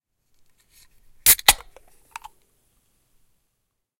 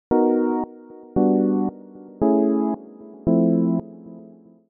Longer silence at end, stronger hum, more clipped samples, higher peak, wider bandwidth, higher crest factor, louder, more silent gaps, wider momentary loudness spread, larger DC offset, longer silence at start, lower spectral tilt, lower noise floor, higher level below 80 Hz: first, 2.45 s vs 0.45 s; neither; neither; first, 0 dBFS vs -8 dBFS; first, 16.5 kHz vs 2.5 kHz; first, 26 dB vs 14 dB; first, -16 LUFS vs -21 LUFS; neither; first, 28 LU vs 22 LU; neither; first, 1.25 s vs 0.1 s; second, 1.5 dB/octave vs -9 dB/octave; first, -77 dBFS vs -47 dBFS; about the same, -48 dBFS vs -50 dBFS